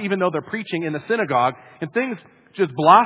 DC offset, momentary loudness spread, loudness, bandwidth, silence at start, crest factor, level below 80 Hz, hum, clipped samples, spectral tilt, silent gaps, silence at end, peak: under 0.1%; 11 LU; -22 LUFS; 4 kHz; 0 s; 20 dB; -68 dBFS; none; under 0.1%; -10 dB/octave; none; 0 s; 0 dBFS